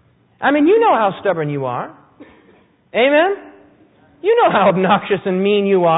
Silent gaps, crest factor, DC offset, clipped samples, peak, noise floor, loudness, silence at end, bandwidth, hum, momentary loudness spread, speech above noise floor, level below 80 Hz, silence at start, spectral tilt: none; 14 dB; under 0.1%; under 0.1%; -2 dBFS; -52 dBFS; -15 LUFS; 0 s; 4 kHz; none; 11 LU; 37 dB; -60 dBFS; 0.4 s; -11.5 dB/octave